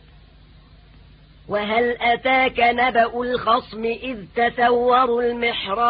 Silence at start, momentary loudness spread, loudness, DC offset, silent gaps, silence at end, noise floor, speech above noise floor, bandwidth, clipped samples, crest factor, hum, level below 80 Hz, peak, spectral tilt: 1.5 s; 9 LU; -19 LUFS; under 0.1%; none; 0 s; -48 dBFS; 29 dB; 5 kHz; under 0.1%; 16 dB; none; -48 dBFS; -6 dBFS; -9 dB/octave